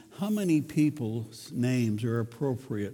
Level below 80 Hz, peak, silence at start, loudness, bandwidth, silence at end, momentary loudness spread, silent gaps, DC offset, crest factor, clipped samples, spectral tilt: -68 dBFS; -14 dBFS; 0.1 s; -30 LUFS; 18.5 kHz; 0 s; 8 LU; none; under 0.1%; 16 dB; under 0.1%; -7 dB/octave